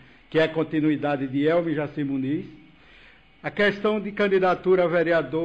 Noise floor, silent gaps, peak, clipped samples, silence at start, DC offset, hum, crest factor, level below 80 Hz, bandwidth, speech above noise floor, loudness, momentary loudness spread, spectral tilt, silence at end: -53 dBFS; none; -12 dBFS; under 0.1%; 0.3 s; under 0.1%; none; 12 dB; -58 dBFS; 8 kHz; 30 dB; -23 LUFS; 8 LU; -8 dB/octave; 0 s